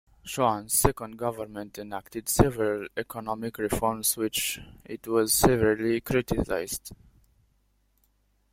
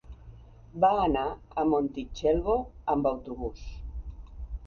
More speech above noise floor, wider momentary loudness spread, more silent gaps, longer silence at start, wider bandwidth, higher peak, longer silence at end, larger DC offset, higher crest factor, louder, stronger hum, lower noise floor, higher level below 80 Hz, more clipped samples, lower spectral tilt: first, 41 dB vs 21 dB; second, 15 LU vs 18 LU; neither; first, 0.25 s vs 0.05 s; first, 16.5 kHz vs 7 kHz; first, -2 dBFS vs -12 dBFS; first, 1.6 s vs 0 s; neither; first, 26 dB vs 18 dB; about the same, -27 LUFS vs -28 LUFS; first, 50 Hz at -55 dBFS vs none; first, -69 dBFS vs -49 dBFS; about the same, -44 dBFS vs -42 dBFS; neither; second, -4 dB/octave vs -7.5 dB/octave